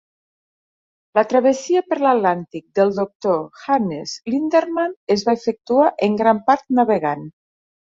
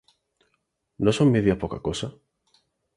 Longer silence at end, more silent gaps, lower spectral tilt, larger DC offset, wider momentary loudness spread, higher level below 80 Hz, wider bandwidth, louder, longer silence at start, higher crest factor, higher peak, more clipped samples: second, 0.65 s vs 0.85 s; first, 3.15-3.20 s, 4.96-5.07 s vs none; about the same, -5.5 dB/octave vs -6.5 dB/octave; neither; second, 7 LU vs 12 LU; second, -64 dBFS vs -48 dBFS; second, 7.8 kHz vs 11.5 kHz; first, -19 LUFS vs -23 LUFS; first, 1.15 s vs 1 s; about the same, 18 dB vs 20 dB; first, -2 dBFS vs -6 dBFS; neither